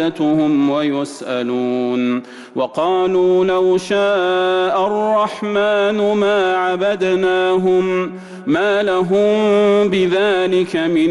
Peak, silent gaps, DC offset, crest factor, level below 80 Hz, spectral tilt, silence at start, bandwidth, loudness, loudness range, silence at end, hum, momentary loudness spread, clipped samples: -8 dBFS; none; under 0.1%; 8 dB; -56 dBFS; -6 dB/octave; 0 s; 11.5 kHz; -16 LUFS; 2 LU; 0 s; none; 6 LU; under 0.1%